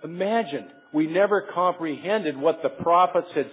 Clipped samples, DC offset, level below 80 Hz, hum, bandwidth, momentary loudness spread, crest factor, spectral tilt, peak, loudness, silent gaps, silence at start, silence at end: under 0.1%; under 0.1%; -68 dBFS; none; 4 kHz; 9 LU; 16 dB; -9.5 dB/octave; -6 dBFS; -24 LUFS; none; 0 s; 0 s